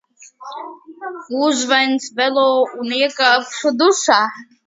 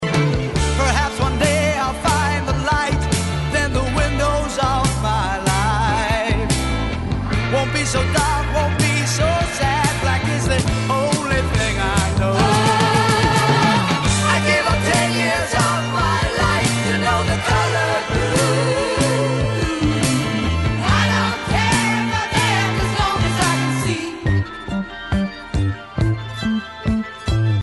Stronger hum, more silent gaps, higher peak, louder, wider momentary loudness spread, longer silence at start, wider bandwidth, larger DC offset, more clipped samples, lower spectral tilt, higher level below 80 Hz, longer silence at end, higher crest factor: neither; neither; about the same, 0 dBFS vs -2 dBFS; about the same, -16 LUFS vs -18 LUFS; first, 18 LU vs 7 LU; first, 0.2 s vs 0 s; second, 7.8 kHz vs 12 kHz; second, under 0.1% vs 0.1%; neither; second, -1 dB/octave vs -4.5 dB/octave; second, -70 dBFS vs -28 dBFS; first, 0.25 s vs 0 s; about the same, 18 dB vs 16 dB